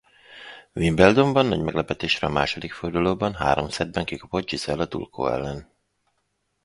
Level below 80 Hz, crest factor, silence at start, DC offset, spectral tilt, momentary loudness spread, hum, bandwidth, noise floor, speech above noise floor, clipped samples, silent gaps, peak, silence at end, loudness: -44 dBFS; 24 dB; 0.3 s; under 0.1%; -5.5 dB/octave; 15 LU; none; 11.5 kHz; -73 dBFS; 51 dB; under 0.1%; none; 0 dBFS; 1 s; -23 LUFS